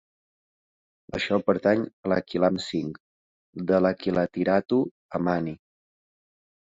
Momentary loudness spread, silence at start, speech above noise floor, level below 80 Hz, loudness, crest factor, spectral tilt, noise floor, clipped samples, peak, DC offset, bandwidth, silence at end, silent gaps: 13 LU; 1.15 s; over 65 dB; -58 dBFS; -26 LUFS; 20 dB; -7 dB/octave; under -90 dBFS; under 0.1%; -8 dBFS; under 0.1%; 7.8 kHz; 1.1 s; 1.93-2.03 s, 3.00-3.53 s, 4.91-5.09 s